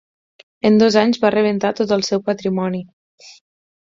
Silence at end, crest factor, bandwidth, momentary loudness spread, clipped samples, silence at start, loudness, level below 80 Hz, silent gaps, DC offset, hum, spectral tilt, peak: 0.5 s; 16 dB; 7.6 kHz; 9 LU; under 0.1%; 0.65 s; -17 LUFS; -60 dBFS; 2.93-3.18 s; under 0.1%; none; -5.5 dB/octave; -2 dBFS